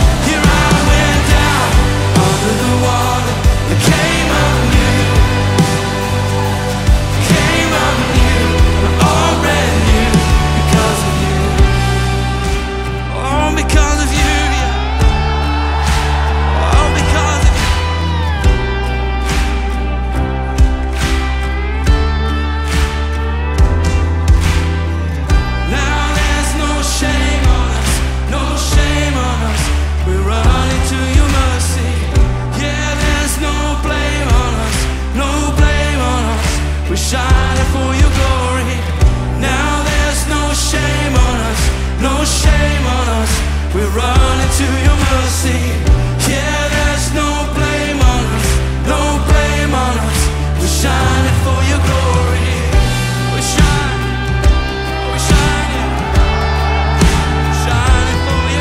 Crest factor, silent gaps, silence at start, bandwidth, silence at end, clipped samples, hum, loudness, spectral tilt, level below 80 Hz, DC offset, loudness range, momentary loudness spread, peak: 12 dB; none; 0 s; 15.5 kHz; 0 s; under 0.1%; none; -14 LUFS; -4.5 dB/octave; -16 dBFS; under 0.1%; 3 LU; 5 LU; 0 dBFS